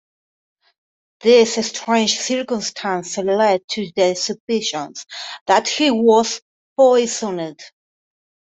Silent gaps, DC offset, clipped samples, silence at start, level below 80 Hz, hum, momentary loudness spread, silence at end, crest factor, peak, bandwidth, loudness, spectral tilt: 3.64-3.68 s, 4.40-4.47 s, 5.41-5.46 s, 6.42-6.76 s; under 0.1%; under 0.1%; 1.25 s; -66 dBFS; none; 14 LU; 0.85 s; 18 dB; -2 dBFS; 8.4 kHz; -18 LUFS; -3 dB/octave